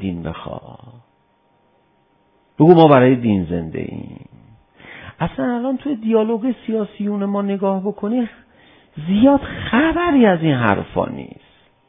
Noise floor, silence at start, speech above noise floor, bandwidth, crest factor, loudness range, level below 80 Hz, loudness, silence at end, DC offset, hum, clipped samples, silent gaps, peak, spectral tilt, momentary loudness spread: -60 dBFS; 0 s; 43 dB; 5.2 kHz; 18 dB; 6 LU; -44 dBFS; -17 LUFS; 0.65 s; under 0.1%; none; under 0.1%; none; 0 dBFS; -11.5 dB/octave; 19 LU